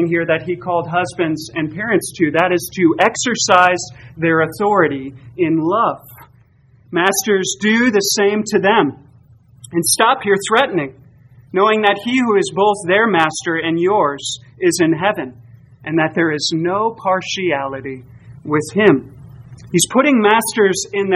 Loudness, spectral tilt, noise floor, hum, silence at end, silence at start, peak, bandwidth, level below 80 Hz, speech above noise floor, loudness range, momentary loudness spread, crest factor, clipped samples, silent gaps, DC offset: -16 LUFS; -4 dB/octave; -50 dBFS; none; 0 s; 0 s; 0 dBFS; 15.5 kHz; -56 dBFS; 34 dB; 3 LU; 10 LU; 16 dB; under 0.1%; none; under 0.1%